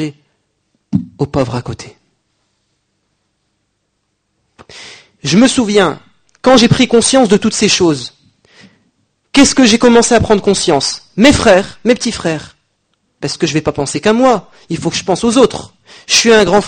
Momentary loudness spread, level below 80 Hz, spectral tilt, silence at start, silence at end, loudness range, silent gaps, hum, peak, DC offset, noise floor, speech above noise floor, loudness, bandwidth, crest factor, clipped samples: 15 LU; -38 dBFS; -4 dB/octave; 0 s; 0 s; 13 LU; none; none; 0 dBFS; under 0.1%; -66 dBFS; 56 dB; -11 LUFS; 9.8 kHz; 12 dB; 0.2%